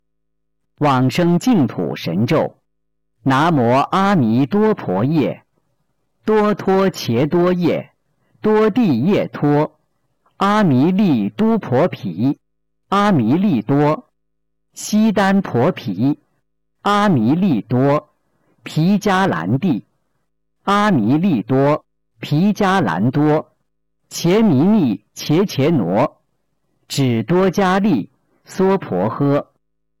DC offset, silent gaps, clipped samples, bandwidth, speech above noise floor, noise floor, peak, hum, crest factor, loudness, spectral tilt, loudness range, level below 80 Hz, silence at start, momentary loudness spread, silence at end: under 0.1%; none; under 0.1%; 17 kHz; 61 dB; -77 dBFS; -8 dBFS; none; 8 dB; -17 LUFS; -7 dB/octave; 2 LU; -52 dBFS; 0.8 s; 8 LU; 0.55 s